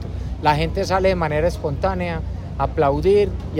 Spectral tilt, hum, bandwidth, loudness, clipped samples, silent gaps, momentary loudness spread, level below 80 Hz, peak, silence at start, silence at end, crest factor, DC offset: -7 dB/octave; none; 15.5 kHz; -20 LUFS; under 0.1%; none; 8 LU; -30 dBFS; -4 dBFS; 0 s; 0 s; 16 dB; under 0.1%